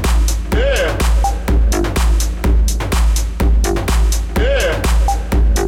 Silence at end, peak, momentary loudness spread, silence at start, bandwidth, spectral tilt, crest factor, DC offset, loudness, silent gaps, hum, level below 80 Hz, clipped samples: 0 s; -6 dBFS; 2 LU; 0 s; 16.5 kHz; -5 dB/octave; 8 dB; under 0.1%; -16 LUFS; none; none; -14 dBFS; under 0.1%